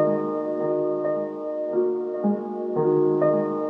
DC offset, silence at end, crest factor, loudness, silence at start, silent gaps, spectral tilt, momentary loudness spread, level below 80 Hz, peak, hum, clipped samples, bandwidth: under 0.1%; 0 s; 14 dB; -24 LUFS; 0 s; none; -11 dB/octave; 7 LU; -82 dBFS; -10 dBFS; none; under 0.1%; 3.4 kHz